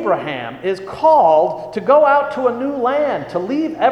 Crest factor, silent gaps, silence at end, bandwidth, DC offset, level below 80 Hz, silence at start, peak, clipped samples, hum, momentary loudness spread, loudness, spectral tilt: 14 dB; none; 0 s; 8.6 kHz; under 0.1%; -56 dBFS; 0 s; -2 dBFS; under 0.1%; none; 11 LU; -16 LUFS; -6.5 dB/octave